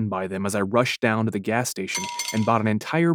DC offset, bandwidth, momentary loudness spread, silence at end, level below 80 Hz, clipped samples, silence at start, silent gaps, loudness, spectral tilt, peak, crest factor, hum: under 0.1%; 19 kHz; 5 LU; 0 s; -68 dBFS; under 0.1%; 0 s; none; -24 LUFS; -5 dB/octave; -4 dBFS; 18 dB; none